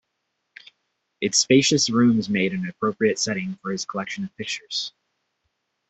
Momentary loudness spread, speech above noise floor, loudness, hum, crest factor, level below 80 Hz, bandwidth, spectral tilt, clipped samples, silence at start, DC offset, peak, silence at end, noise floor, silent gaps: 12 LU; 55 dB; -22 LUFS; none; 20 dB; -64 dBFS; 8.4 kHz; -3.5 dB/octave; under 0.1%; 1.2 s; under 0.1%; -4 dBFS; 1 s; -77 dBFS; none